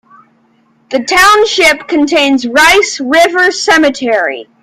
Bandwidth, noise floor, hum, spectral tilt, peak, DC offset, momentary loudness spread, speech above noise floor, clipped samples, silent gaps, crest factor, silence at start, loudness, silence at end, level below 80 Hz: 16.5 kHz; -51 dBFS; none; -1.5 dB/octave; 0 dBFS; under 0.1%; 7 LU; 42 dB; 0.2%; none; 10 dB; 0.9 s; -8 LUFS; 0.2 s; -44 dBFS